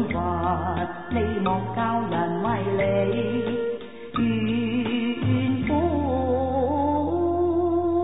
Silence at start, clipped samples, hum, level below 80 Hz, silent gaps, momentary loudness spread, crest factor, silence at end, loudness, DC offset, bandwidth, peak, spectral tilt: 0 s; under 0.1%; none; -40 dBFS; none; 4 LU; 12 dB; 0 s; -24 LUFS; 0.6%; 4 kHz; -10 dBFS; -12 dB/octave